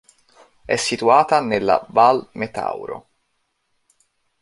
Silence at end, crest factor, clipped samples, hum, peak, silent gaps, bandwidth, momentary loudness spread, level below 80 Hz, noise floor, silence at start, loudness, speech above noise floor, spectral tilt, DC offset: 1.4 s; 20 dB; under 0.1%; none; -2 dBFS; none; 11.5 kHz; 14 LU; -58 dBFS; -70 dBFS; 0.7 s; -18 LUFS; 53 dB; -4 dB/octave; under 0.1%